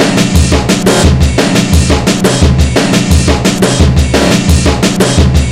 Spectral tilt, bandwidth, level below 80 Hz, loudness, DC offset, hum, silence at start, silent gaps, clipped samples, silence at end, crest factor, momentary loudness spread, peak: -5 dB/octave; 15.5 kHz; -14 dBFS; -8 LUFS; 0.4%; none; 0 s; none; 2%; 0 s; 8 dB; 2 LU; 0 dBFS